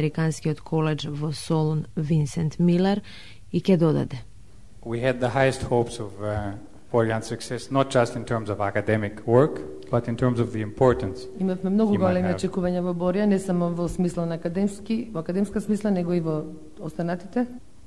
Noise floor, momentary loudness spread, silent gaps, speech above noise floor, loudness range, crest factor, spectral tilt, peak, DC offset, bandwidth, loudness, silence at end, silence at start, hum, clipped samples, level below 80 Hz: -49 dBFS; 10 LU; none; 25 dB; 3 LU; 20 dB; -7 dB/octave; -6 dBFS; 0.7%; 12 kHz; -25 LUFS; 0.25 s; 0 s; none; under 0.1%; -48 dBFS